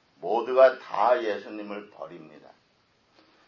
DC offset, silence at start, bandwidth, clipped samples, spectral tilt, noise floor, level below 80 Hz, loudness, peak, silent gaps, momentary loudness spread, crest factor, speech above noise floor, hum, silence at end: under 0.1%; 0.2 s; 6.4 kHz; under 0.1%; -5.5 dB/octave; -66 dBFS; -82 dBFS; -24 LUFS; -6 dBFS; none; 22 LU; 22 dB; 41 dB; none; 1.3 s